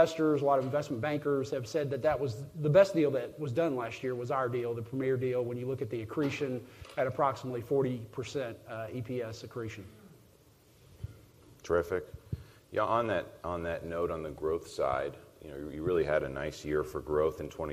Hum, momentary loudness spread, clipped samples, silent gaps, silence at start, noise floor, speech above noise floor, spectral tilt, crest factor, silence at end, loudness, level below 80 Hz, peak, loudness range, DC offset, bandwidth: none; 13 LU; under 0.1%; none; 0 s; -61 dBFS; 29 dB; -7 dB/octave; 22 dB; 0 s; -33 LUFS; -58 dBFS; -12 dBFS; 9 LU; under 0.1%; 15.5 kHz